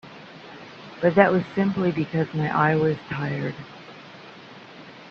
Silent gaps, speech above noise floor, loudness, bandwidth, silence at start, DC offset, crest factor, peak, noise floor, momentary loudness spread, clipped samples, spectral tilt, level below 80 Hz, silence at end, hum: none; 22 dB; -23 LUFS; 6.8 kHz; 0.05 s; under 0.1%; 24 dB; 0 dBFS; -44 dBFS; 24 LU; under 0.1%; -8.5 dB/octave; -62 dBFS; 0 s; none